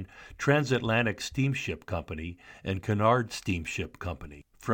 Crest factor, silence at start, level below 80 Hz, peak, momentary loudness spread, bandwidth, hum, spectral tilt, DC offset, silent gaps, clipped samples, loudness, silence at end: 18 dB; 0 s; -50 dBFS; -10 dBFS; 15 LU; 17 kHz; none; -5.5 dB/octave; under 0.1%; none; under 0.1%; -29 LUFS; 0 s